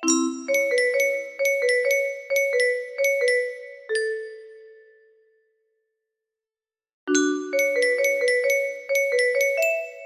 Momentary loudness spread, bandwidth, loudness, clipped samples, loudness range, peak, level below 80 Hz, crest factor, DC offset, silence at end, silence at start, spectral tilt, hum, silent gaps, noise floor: 6 LU; 15 kHz; -22 LUFS; under 0.1%; 12 LU; -8 dBFS; -76 dBFS; 16 dB; under 0.1%; 0 s; 0 s; -0.5 dB/octave; none; 6.94-7.07 s; under -90 dBFS